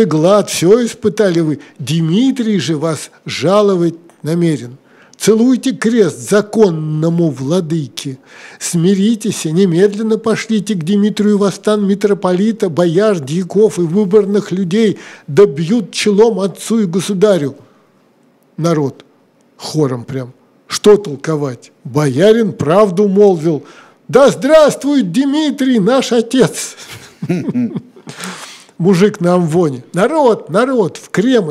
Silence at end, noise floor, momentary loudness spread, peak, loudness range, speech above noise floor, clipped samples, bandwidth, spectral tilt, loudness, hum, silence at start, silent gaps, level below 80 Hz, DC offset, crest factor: 0 s; -51 dBFS; 13 LU; 0 dBFS; 5 LU; 39 dB; under 0.1%; 15 kHz; -6 dB/octave; -13 LUFS; none; 0 s; none; -56 dBFS; under 0.1%; 12 dB